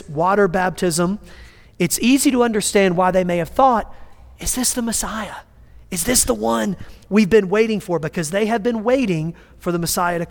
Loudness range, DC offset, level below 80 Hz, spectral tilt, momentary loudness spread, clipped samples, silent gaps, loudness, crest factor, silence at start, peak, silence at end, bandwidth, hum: 3 LU; under 0.1%; -40 dBFS; -4 dB/octave; 12 LU; under 0.1%; none; -18 LUFS; 18 dB; 0.05 s; -2 dBFS; 0 s; 19 kHz; none